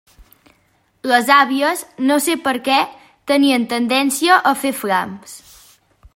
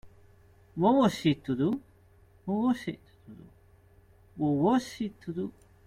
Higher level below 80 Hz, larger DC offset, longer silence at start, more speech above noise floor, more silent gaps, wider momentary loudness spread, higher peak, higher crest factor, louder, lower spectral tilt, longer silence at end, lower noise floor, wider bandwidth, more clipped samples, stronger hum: about the same, -58 dBFS vs -62 dBFS; neither; first, 1.05 s vs 0.05 s; first, 44 dB vs 31 dB; neither; about the same, 14 LU vs 16 LU; first, 0 dBFS vs -10 dBFS; about the same, 18 dB vs 20 dB; first, -16 LUFS vs -29 LUFS; second, -2.5 dB/octave vs -7 dB/octave; first, 0.8 s vs 0.35 s; about the same, -60 dBFS vs -59 dBFS; first, 16.5 kHz vs 14.5 kHz; neither; neither